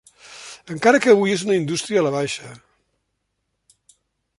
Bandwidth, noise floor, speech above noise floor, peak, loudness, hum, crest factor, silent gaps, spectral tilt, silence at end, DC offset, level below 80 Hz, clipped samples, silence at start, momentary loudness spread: 11.5 kHz; -75 dBFS; 56 dB; -2 dBFS; -19 LUFS; none; 20 dB; none; -4.5 dB/octave; 1.85 s; under 0.1%; -64 dBFS; under 0.1%; 0.3 s; 22 LU